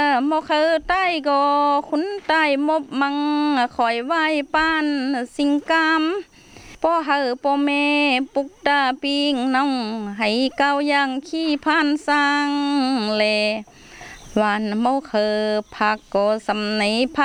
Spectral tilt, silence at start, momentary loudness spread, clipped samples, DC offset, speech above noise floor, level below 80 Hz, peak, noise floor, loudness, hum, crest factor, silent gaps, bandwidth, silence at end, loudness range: -4 dB/octave; 0 s; 6 LU; under 0.1%; under 0.1%; 24 dB; -54 dBFS; -4 dBFS; -44 dBFS; -20 LUFS; none; 16 dB; none; 10.5 kHz; 0 s; 2 LU